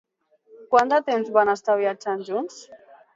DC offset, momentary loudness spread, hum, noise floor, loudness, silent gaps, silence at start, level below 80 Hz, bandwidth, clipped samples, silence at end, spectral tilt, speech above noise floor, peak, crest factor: under 0.1%; 10 LU; none; -56 dBFS; -22 LUFS; none; 0.6 s; -70 dBFS; 7.8 kHz; under 0.1%; 0.4 s; -4.5 dB/octave; 34 dB; -4 dBFS; 20 dB